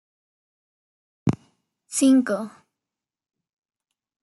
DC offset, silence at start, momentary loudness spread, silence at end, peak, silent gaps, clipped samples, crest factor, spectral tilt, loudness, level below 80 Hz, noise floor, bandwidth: under 0.1%; 1.25 s; 17 LU; 1.75 s; -6 dBFS; none; under 0.1%; 20 dB; -5.5 dB/octave; -22 LUFS; -62 dBFS; -89 dBFS; 12 kHz